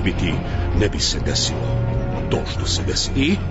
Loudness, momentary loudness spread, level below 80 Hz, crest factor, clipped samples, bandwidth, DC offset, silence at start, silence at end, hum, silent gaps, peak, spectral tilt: -21 LUFS; 4 LU; -28 dBFS; 14 dB; under 0.1%; 8 kHz; under 0.1%; 0 s; 0 s; none; none; -6 dBFS; -4.5 dB/octave